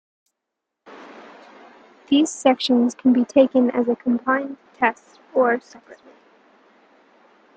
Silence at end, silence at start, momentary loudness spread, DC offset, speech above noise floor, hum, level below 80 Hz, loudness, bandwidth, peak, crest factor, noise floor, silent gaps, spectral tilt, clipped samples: 1.65 s; 0.9 s; 11 LU; under 0.1%; 62 dB; none; -70 dBFS; -20 LUFS; 9.2 kHz; -2 dBFS; 20 dB; -82 dBFS; none; -4 dB/octave; under 0.1%